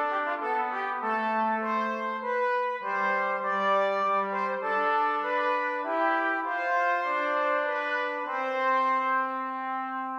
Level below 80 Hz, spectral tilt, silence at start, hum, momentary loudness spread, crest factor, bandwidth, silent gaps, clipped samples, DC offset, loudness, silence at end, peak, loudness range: -88 dBFS; -5 dB/octave; 0 s; none; 5 LU; 12 dB; 7.8 kHz; none; under 0.1%; under 0.1%; -27 LUFS; 0 s; -14 dBFS; 1 LU